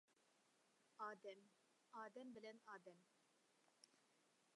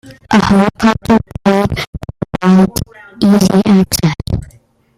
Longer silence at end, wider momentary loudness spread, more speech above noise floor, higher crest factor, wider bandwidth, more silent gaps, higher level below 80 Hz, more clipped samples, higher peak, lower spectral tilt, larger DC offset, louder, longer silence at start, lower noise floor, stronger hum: second, 0 s vs 0.5 s; second, 9 LU vs 13 LU; second, 21 dB vs 34 dB; first, 22 dB vs 12 dB; second, 11 kHz vs 15.5 kHz; second, none vs 1.87-1.93 s; second, under -90 dBFS vs -34 dBFS; neither; second, -40 dBFS vs 0 dBFS; second, -4 dB/octave vs -6 dB/octave; neither; second, -59 LUFS vs -12 LUFS; about the same, 0.1 s vs 0.05 s; first, -81 dBFS vs -45 dBFS; neither